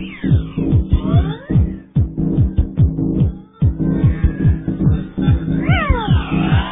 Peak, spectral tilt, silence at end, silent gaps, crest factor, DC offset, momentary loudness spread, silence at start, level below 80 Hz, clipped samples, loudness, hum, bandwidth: -2 dBFS; -12.5 dB/octave; 0 s; none; 14 dB; 0.1%; 3 LU; 0 s; -24 dBFS; under 0.1%; -17 LUFS; none; 3.9 kHz